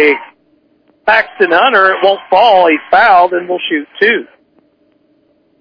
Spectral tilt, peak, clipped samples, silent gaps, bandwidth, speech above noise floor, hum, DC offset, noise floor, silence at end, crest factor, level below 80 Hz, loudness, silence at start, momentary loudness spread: -5 dB/octave; 0 dBFS; 0.5%; none; 5.4 kHz; 44 dB; none; under 0.1%; -54 dBFS; 1.4 s; 12 dB; -56 dBFS; -10 LUFS; 0 s; 9 LU